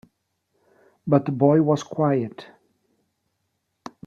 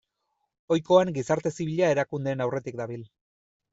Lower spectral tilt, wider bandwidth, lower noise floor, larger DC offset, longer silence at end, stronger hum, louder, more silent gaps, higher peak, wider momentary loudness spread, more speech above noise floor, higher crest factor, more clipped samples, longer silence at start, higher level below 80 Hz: first, -8.5 dB/octave vs -6 dB/octave; about the same, 7.4 kHz vs 8 kHz; about the same, -75 dBFS vs -78 dBFS; neither; first, 1.65 s vs 0.65 s; neither; first, -21 LUFS vs -26 LUFS; neither; about the same, -4 dBFS vs -6 dBFS; first, 25 LU vs 13 LU; about the same, 55 dB vs 53 dB; about the same, 20 dB vs 20 dB; neither; first, 1.05 s vs 0.7 s; about the same, -68 dBFS vs -66 dBFS